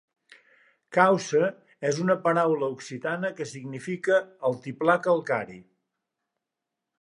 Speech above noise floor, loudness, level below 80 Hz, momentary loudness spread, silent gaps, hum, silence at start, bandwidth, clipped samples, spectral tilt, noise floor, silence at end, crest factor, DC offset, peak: 61 dB; -26 LUFS; -76 dBFS; 12 LU; none; none; 0.9 s; 11 kHz; under 0.1%; -5.5 dB/octave; -86 dBFS; 1.4 s; 22 dB; under 0.1%; -4 dBFS